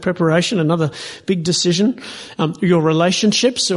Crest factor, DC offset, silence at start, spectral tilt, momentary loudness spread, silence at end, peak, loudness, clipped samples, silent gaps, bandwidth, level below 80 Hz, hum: 14 dB; under 0.1%; 0 s; -4.5 dB/octave; 8 LU; 0 s; -2 dBFS; -16 LUFS; under 0.1%; none; 11.5 kHz; -56 dBFS; none